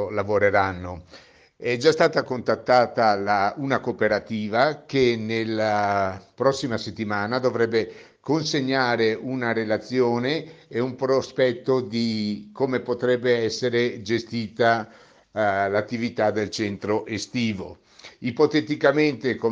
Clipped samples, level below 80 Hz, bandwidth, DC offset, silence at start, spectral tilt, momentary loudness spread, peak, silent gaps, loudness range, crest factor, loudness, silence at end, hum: under 0.1%; -62 dBFS; 9.4 kHz; under 0.1%; 0 s; -5.5 dB/octave; 8 LU; -4 dBFS; none; 3 LU; 18 dB; -23 LUFS; 0 s; none